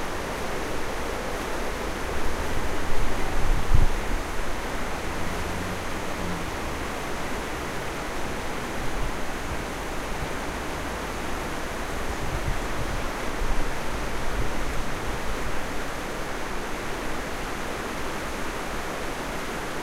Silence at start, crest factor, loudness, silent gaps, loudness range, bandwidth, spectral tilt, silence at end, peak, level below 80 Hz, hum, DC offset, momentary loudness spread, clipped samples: 0 s; 20 dB; -31 LUFS; none; 2 LU; 15.5 kHz; -4.5 dB/octave; 0 s; -6 dBFS; -30 dBFS; none; under 0.1%; 2 LU; under 0.1%